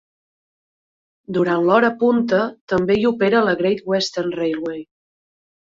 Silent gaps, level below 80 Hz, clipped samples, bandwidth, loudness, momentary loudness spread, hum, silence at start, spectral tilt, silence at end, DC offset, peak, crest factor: 2.61-2.67 s; -56 dBFS; under 0.1%; 7.8 kHz; -19 LUFS; 8 LU; none; 1.3 s; -6 dB/octave; 0.8 s; under 0.1%; -2 dBFS; 18 dB